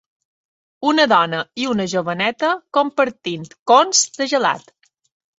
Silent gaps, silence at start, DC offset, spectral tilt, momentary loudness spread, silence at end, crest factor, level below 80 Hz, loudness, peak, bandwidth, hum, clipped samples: 3.59-3.66 s; 0.8 s; under 0.1%; -2.5 dB/octave; 9 LU; 0.8 s; 18 dB; -64 dBFS; -18 LUFS; -2 dBFS; 8 kHz; none; under 0.1%